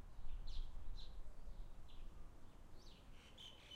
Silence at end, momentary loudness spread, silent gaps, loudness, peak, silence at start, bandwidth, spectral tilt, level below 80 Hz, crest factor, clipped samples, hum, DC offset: 0 s; 9 LU; none; -59 LUFS; -34 dBFS; 0 s; 8 kHz; -4.5 dB/octave; -52 dBFS; 14 dB; under 0.1%; none; under 0.1%